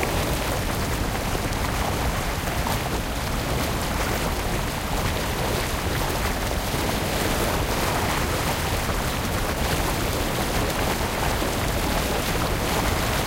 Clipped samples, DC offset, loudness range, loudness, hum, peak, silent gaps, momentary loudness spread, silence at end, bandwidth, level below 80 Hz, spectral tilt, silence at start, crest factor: under 0.1%; under 0.1%; 2 LU; -25 LUFS; none; -8 dBFS; none; 3 LU; 0 s; 17 kHz; -30 dBFS; -4 dB/octave; 0 s; 16 dB